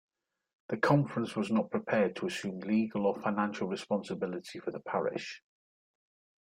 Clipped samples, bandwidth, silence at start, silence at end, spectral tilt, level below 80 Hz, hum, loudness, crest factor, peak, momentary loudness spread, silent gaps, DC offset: under 0.1%; 11 kHz; 0.7 s; 1.15 s; -6.5 dB/octave; -74 dBFS; none; -33 LUFS; 22 dB; -12 dBFS; 12 LU; none; under 0.1%